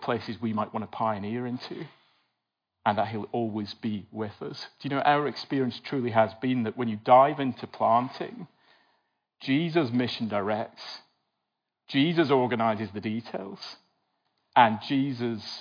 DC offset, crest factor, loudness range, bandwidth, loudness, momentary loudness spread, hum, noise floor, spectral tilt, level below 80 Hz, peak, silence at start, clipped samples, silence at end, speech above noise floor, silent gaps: under 0.1%; 22 dB; 7 LU; 5.2 kHz; -27 LUFS; 16 LU; none; -84 dBFS; -7.5 dB/octave; -82 dBFS; -6 dBFS; 0 s; under 0.1%; 0 s; 57 dB; none